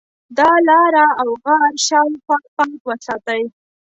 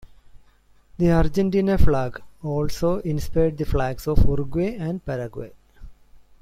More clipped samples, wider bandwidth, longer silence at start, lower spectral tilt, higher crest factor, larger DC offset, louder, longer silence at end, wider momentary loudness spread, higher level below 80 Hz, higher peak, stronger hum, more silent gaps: neither; second, 8.4 kHz vs 14.5 kHz; about the same, 0.3 s vs 0.35 s; second, -1.5 dB/octave vs -8 dB/octave; about the same, 14 dB vs 18 dB; neither; first, -15 LUFS vs -24 LUFS; first, 0.5 s vs 0.25 s; first, 13 LU vs 10 LU; second, -62 dBFS vs -28 dBFS; about the same, -2 dBFS vs -4 dBFS; neither; first, 2.48-2.57 s, 2.80-2.85 s vs none